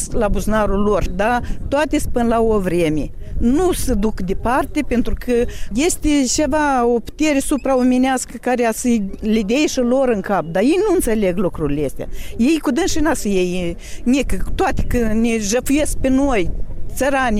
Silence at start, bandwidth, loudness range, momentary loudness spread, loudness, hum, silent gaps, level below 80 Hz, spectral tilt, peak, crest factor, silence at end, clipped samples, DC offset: 0 s; 16 kHz; 2 LU; 6 LU; -18 LUFS; none; none; -26 dBFS; -5 dB/octave; -8 dBFS; 10 dB; 0 s; under 0.1%; under 0.1%